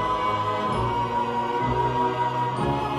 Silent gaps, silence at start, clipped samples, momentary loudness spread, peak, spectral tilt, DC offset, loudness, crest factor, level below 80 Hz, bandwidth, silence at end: none; 0 s; under 0.1%; 2 LU; -12 dBFS; -6.5 dB/octave; under 0.1%; -25 LUFS; 12 dB; -44 dBFS; 13 kHz; 0 s